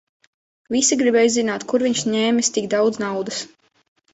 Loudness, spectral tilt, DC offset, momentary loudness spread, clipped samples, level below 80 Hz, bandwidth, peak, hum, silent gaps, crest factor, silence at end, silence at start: -19 LUFS; -3 dB/octave; under 0.1%; 10 LU; under 0.1%; -64 dBFS; 8.4 kHz; -6 dBFS; none; none; 16 dB; 0.65 s; 0.7 s